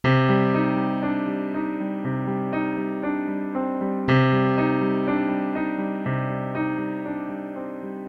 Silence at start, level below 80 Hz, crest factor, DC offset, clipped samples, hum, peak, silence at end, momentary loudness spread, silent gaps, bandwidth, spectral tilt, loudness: 0.05 s; -56 dBFS; 16 dB; under 0.1%; under 0.1%; none; -6 dBFS; 0 s; 9 LU; none; 6.2 kHz; -9 dB/octave; -24 LUFS